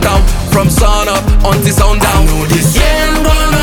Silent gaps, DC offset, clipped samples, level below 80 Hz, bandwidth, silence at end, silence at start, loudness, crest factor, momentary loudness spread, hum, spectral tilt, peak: none; under 0.1%; under 0.1%; -12 dBFS; 18 kHz; 0 s; 0 s; -10 LUFS; 8 dB; 2 LU; none; -4.5 dB/octave; 0 dBFS